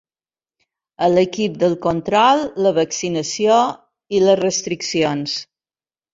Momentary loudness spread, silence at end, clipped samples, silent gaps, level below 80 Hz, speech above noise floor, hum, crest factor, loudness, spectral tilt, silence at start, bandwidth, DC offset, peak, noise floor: 8 LU; 0.7 s; under 0.1%; none; -58 dBFS; over 73 dB; none; 18 dB; -18 LUFS; -4 dB/octave; 1 s; 7.8 kHz; under 0.1%; -2 dBFS; under -90 dBFS